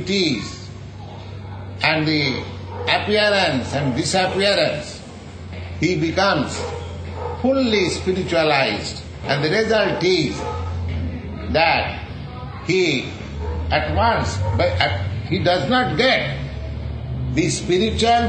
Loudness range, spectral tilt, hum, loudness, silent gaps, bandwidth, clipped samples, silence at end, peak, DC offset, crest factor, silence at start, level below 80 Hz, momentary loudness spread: 3 LU; -5 dB/octave; none; -20 LUFS; none; 9.6 kHz; under 0.1%; 0 s; -2 dBFS; under 0.1%; 18 dB; 0 s; -36 dBFS; 15 LU